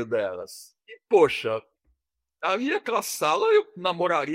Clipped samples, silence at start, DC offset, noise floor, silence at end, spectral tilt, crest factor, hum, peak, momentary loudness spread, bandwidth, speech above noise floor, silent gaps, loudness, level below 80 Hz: under 0.1%; 0 s; under 0.1%; -79 dBFS; 0 s; -3.5 dB/octave; 18 dB; none; -8 dBFS; 13 LU; 16 kHz; 54 dB; none; -24 LUFS; -70 dBFS